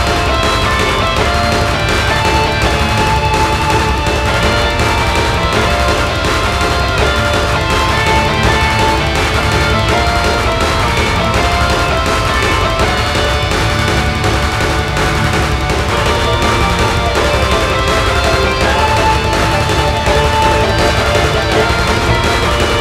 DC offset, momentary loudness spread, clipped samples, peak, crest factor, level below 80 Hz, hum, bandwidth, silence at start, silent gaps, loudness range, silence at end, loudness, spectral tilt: under 0.1%; 2 LU; under 0.1%; 0 dBFS; 12 dB; -20 dBFS; none; 16 kHz; 0 s; none; 1 LU; 0 s; -12 LUFS; -4.5 dB/octave